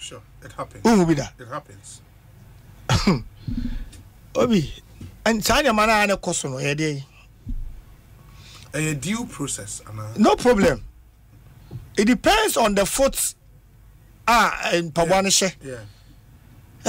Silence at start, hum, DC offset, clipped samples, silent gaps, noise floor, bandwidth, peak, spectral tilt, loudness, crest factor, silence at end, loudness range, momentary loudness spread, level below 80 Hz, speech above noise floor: 0 s; none; under 0.1%; under 0.1%; none; -50 dBFS; 16 kHz; -6 dBFS; -4 dB/octave; -21 LUFS; 18 dB; 0 s; 7 LU; 21 LU; -38 dBFS; 29 dB